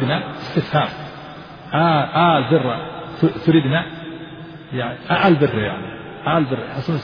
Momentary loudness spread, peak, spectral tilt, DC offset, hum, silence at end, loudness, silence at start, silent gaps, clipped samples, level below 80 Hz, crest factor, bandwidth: 18 LU; -2 dBFS; -8.5 dB/octave; under 0.1%; none; 0 s; -19 LUFS; 0 s; none; under 0.1%; -50 dBFS; 18 dB; 5.4 kHz